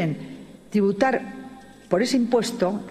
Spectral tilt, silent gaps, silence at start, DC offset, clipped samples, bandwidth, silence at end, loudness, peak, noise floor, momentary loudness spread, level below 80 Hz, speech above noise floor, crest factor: -5.5 dB/octave; none; 0 s; under 0.1%; under 0.1%; 14 kHz; 0 s; -23 LUFS; -6 dBFS; -43 dBFS; 19 LU; -60 dBFS; 21 dB; 18 dB